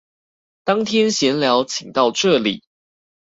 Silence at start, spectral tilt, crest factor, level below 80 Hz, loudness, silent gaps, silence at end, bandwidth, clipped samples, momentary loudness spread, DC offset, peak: 0.65 s; -3.5 dB/octave; 18 dB; -62 dBFS; -18 LUFS; none; 0.65 s; 8 kHz; under 0.1%; 7 LU; under 0.1%; -2 dBFS